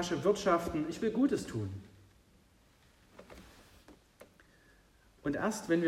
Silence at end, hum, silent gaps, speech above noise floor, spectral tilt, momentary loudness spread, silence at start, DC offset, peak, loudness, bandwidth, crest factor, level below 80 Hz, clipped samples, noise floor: 0 s; none; none; 33 dB; -5.5 dB/octave; 24 LU; 0 s; under 0.1%; -16 dBFS; -33 LUFS; 15.5 kHz; 20 dB; -62 dBFS; under 0.1%; -65 dBFS